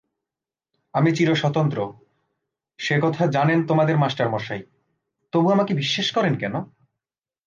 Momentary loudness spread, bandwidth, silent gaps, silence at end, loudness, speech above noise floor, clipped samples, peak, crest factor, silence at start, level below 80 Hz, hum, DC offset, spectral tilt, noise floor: 11 LU; 7.4 kHz; none; 0.8 s; -21 LUFS; 69 dB; under 0.1%; -8 dBFS; 16 dB; 0.95 s; -66 dBFS; none; under 0.1%; -6.5 dB/octave; -89 dBFS